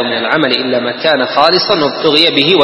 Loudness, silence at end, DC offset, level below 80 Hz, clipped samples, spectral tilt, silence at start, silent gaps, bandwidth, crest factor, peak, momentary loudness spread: -11 LUFS; 0 s; under 0.1%; -58 dBFS; 0.2%; -5 dB/octave; 0 s; none; 11 kHz; 12 dB; 0 dBFS; 5 LU